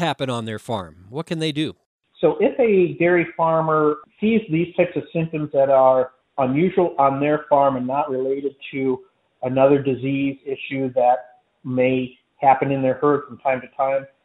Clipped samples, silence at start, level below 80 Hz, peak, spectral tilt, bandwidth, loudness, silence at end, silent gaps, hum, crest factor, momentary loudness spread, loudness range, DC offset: under 0.1%; 0 s; -62 dBFS; -2 dBFS; -7.5 dB/octave; 11.5 kHz; -20 LUFS; 0.2 s; 1.86-1.99 s; none; 18 dB; 11 LU; 3 LU; under 0.1%